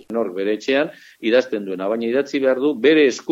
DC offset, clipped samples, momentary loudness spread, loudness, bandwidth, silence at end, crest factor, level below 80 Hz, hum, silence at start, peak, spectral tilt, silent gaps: under 0.1%; under 0.1%; 10 LU; -19 LUFS; 8 kHz; 0 s; 16 dB; -70 dBFS; none; 0.1 s; -2 dBFS; -4.5 dB/octave; none